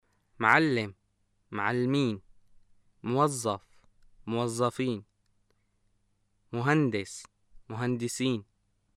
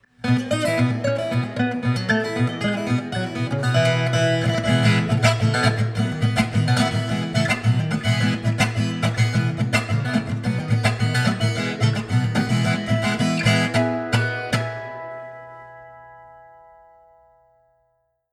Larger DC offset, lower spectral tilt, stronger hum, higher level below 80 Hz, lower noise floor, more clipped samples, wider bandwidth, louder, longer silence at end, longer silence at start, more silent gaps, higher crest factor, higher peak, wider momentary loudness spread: neither; about the same, -5.5 dB/octave vs -6 dB/octave; neither; second, -66 dBFS vs -52 dBFS; first, -73 dBFS vs -68 dBFS; neither; first, 15 kHz vs 13.5 kHz; second, -29 LUFS vs -21 LUFS; second, 0.55 s vs 1.95 s; first, 0.4 s vs 0.25 s; neither; first, 24 dB vs 18 dB; about the same, -6 dBFS vs -4 dBFS; first, 17 LU vs 6 LU